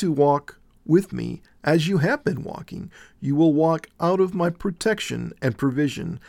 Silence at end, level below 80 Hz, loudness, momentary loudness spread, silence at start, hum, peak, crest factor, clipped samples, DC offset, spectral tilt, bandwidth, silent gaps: 0.1 s; -52 dBFS; -23 LUFS; 14 LU; 0 s; none; -6 dBFS; 16 dB; under 0.1%; under 0.1%; -6.5 dB/octave; 16 kHz; none